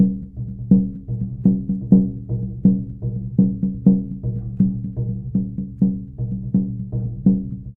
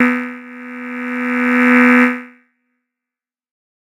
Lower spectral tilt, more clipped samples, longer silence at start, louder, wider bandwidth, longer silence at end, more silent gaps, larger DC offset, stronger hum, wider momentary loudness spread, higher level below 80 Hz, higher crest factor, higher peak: first, -15.5 dB/octave vs -5 dB/octave; neither; about the same, 0 s vs 0 s; second, -21 LUFS vs -13 LUFS; second, 1 kHz vs 11 kHz; second, 0 s vs 1.55 s; neither; neither; neither; second, 10 LU vs 20 LU; first, -40 dBFS vs -68 dBFS; about the same, 20 dB vs 16 dB; about the same, 0 dBFS vs 0 dBFS